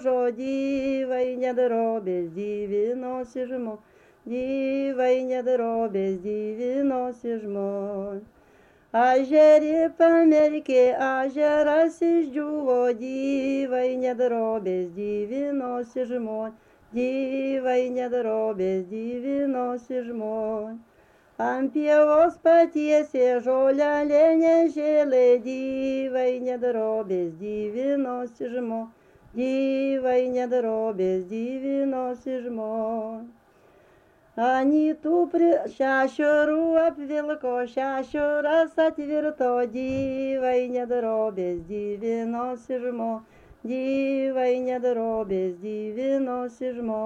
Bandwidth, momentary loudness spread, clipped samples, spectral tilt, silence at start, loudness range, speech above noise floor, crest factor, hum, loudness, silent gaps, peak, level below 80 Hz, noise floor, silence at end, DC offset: 8 kHz; 12 LU; under 0.1%; -6.5 dB/octave; 0 s; 8 LU; 34 dB; 16 dB; none; -24 LUFS; none; -8 dBFS; -62 dBFS; -58 dBFS; 0 s; under 0.1%